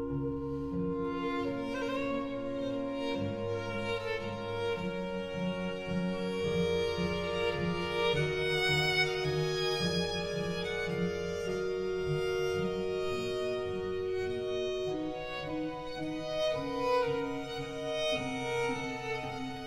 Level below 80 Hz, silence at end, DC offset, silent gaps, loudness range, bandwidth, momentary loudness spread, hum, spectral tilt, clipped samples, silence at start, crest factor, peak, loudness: -54 dBFS; 0 s; under 0.1%; none; 5 LU; 16 kHz; 7 LU; none; -5.5 dB/octave; under 0.1%; 0 s; 18 dB; -16 dBFS; -33 LUFS